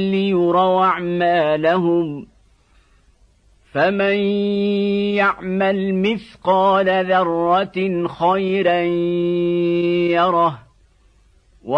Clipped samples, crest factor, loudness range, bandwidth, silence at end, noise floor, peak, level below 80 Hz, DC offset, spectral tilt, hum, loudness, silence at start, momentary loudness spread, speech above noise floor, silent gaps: under 0.1%; 14 dB; 3 LU; 6 kHz; 0 s; -54 dBFS; -4 dBFS; -54 dBFS; under 0.1%; -8 dB/octave; none; -18 LUFS; 0 s; 5 LU; 37 dB; none